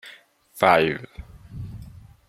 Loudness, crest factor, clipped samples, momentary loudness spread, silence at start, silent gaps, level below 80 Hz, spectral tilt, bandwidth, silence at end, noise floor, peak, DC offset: -20 LUFS; 24 dB; under 0.1%; 25 LU; 0.05 s; none; -48 dBFS; -5.5 dB/octave; 16.5 kHz; 0.4 s; -50 dBFS; -2 dBFS; under 0.1%